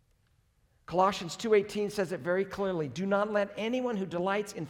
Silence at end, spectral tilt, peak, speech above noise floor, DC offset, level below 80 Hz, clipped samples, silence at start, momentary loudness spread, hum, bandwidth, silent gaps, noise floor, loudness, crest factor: 0 s; -5.5 dB/octave; -12 dBFS; 39 dB; under 0.1%; -66 dBFS; under 0.1%; 0.9 s; 6 LU; none; 16.5 kHz; none; -69 dBFS; -31 LUFS; 18 dB